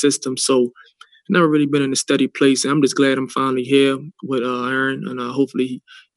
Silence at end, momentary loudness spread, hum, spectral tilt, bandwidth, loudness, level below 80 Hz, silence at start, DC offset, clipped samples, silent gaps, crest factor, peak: 0.35 s; 9 LU; none; -4 dB/octave; 12.5 kHz; -18 LUFS; -70 dBFS; 0 s; under 0.1%; under 0.1%; none; 16 dB; -2 dBFS